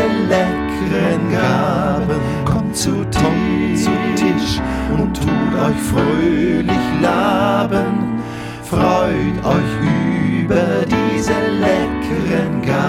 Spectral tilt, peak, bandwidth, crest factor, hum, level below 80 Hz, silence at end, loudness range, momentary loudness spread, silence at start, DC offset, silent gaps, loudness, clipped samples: -6 dB/octave; 0 dBFS; 16 kHz; 16 dB; none; -34 dBFS; 0 s; 1 LU; 4 LU; 0 s; under 0.1%; none; -16 LUFS; under 0.1%